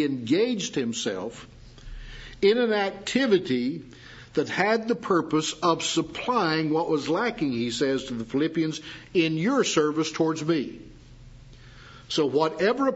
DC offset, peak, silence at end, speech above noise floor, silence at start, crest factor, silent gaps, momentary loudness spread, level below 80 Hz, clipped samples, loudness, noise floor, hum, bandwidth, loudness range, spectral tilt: under 0.1%; -6 dBFS; 0 s; 22 dB; 0 s; 20 dB; none; 13 LU; -52 dBFS; under 0.1%; -25 LUFS; -47 dBFS; none; 8 kHz; 2 LU; -4.5 dB/octave